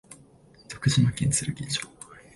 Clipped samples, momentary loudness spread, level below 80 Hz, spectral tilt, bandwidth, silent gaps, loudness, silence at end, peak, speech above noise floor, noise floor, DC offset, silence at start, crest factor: under 0.1%; 19 LU; -50 dBFS; -4 dB/octave; 11.5 kHz; none; -26 LUFS; 0.15 s; -10 dBFS; 30 dB; -55 dBFS; under 0.1%; 0.1 s; 18 dB